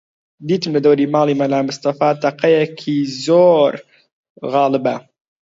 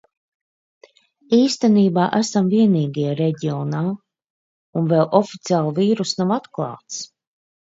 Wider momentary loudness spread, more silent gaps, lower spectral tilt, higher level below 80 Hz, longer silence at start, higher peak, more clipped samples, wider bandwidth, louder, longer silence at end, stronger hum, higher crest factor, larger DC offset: second, 9 LU vs 13 LU; second, 4.12-4.24 s, 4.30-4.35 s vs 4.30-4.73 s; about the same, -6.5 dB/octave vs -6.5 dB/octave; about the same, -66 dBFS vs -68 dBFS; second, 0.4 s vs 1.3 s; about the same, -2 dBFS vs -2 dBFS; neither; about the same, 7.8 kHz vs 7.8 kHz; first, -16 LUFS vs -19 LUFS; second, 0.4 s vs 0.65 s; neither; about the same, 16 dB vs 18 dB; neither